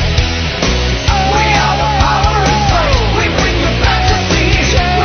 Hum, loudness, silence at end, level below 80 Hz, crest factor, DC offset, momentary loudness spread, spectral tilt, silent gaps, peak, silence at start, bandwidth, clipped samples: none; -12 LUFS; 0 s; -18 dBFS; 12 dB; under 0.1%; 3 LU; -4.5 dB/octave; none; 0 dBFS; 0 s; 6.6 kHz; under 0.1%